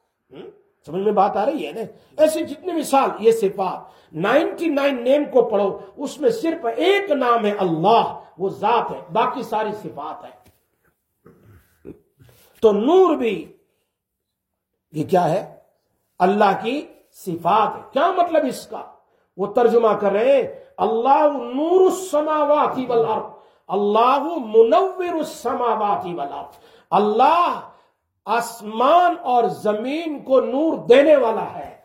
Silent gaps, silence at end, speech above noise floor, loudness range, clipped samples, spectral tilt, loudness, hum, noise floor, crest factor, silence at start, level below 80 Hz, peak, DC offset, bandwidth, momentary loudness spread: none; 0.1 s; 60 dB; 5 LU; under 0.1%; -5.5 dB/octave; -19 LUFS; none; -79 dBFS; 18 dB; 0.35 s; -66 dBFS; -2 dBFS; under 0.1%; 16.5 kHz; 15 LU